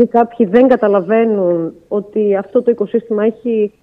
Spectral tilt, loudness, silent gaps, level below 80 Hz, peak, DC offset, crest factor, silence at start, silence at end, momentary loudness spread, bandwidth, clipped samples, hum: -9.5 dB/octave; -14 LUFS; none; -58 dBFS; 0 dBFS; under 0.1%; 14 dB; 0 s; 0.15 s; 8 LU; 4.3 kHz; under 0.1%; none